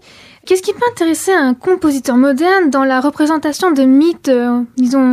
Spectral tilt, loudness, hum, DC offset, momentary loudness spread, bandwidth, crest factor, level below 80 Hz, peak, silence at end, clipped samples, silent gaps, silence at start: -3.5 dB/octave; -13 LUFS; none; under 0.1%; 5 LU; 15 kHz; 10 dB; -54 dBFS; -2 dBFS; 0 s; under 0.1%; none; 0.45 s